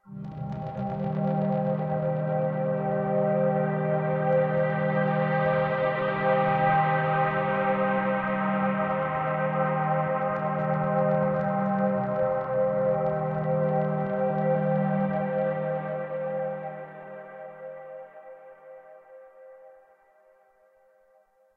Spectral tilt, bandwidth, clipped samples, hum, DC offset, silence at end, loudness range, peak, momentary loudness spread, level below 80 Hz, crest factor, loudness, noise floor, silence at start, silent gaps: -10.5 dB/octave; 4.6 kHz; under 0.1%; none; under 0.1%; 1.85 s; 12 LU; -12 dBFS; 12 LU; -60 dBFS; 14 dB; -26 LUFS; -63 dBFS; 0.05 s; none